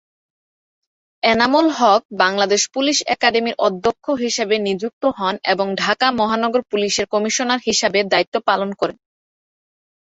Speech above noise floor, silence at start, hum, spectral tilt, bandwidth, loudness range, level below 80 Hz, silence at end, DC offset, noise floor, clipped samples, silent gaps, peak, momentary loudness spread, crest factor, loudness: over 72 dB; 1.25 s; none; -2.5 dB/octave; 8.4 kHz; 3 LU; -58 dBFS; 1.15 s; under 0.1%; under -90 dBFS; under 0.1%; 2.05-2.09 s, 4.93-5.01 s, 8.27-8.32 s; 0 dBFS; 6 LU; 18 dB; -18 LUFS